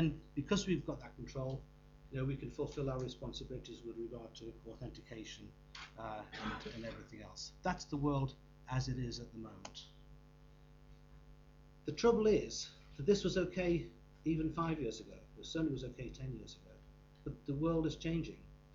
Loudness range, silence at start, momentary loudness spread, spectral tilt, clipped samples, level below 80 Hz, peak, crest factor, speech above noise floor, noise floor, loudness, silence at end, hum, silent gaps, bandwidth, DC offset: 11 LU; 0 s; 17 LU; -6 dB/octave; under 0.1%; -56 dBFS; -20 dBFS; 22 dB; 22 dB; -61 dBFS; -40 LUFS; 0 s; 50 Hz at -55 dBFS; none; 7.8 kHz; under 0.1%